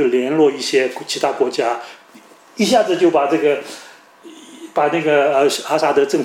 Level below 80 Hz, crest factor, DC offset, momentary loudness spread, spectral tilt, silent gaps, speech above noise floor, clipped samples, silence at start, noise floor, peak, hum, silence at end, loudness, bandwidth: -66 dBFS; 14 dB; under 0.1%; 13 LU; -4 dB/octave; none; 29 dB; under 0.1%; 0 s; -45 dBFS; -2 dBFS; none; 0 s; -17 LUFS; 16 kHz